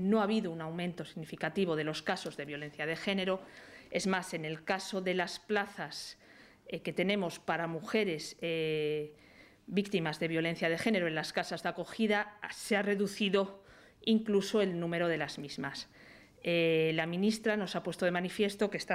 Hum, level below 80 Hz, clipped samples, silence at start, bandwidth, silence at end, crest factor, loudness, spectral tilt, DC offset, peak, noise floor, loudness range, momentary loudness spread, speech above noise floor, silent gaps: none; -70 dBFS; under 0.1%; 0 s; 15 kHz; 0 s; 18 dB; -34 LUFS; -5 dB/octave; under 0.1%; -16 dBFS; -57 dBFS; 3 LU; 10 LU; 24 dB; none